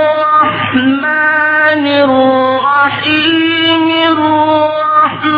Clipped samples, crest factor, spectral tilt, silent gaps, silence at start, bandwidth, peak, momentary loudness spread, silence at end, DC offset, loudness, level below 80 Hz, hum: under 0.1%; 10 dB; -7 dB/octave; none; 0 s; 5.2 kHz; 0 dBFS; 2 LU; 0 s; under 0.1%; -10 LUFS; -52 dBFS; none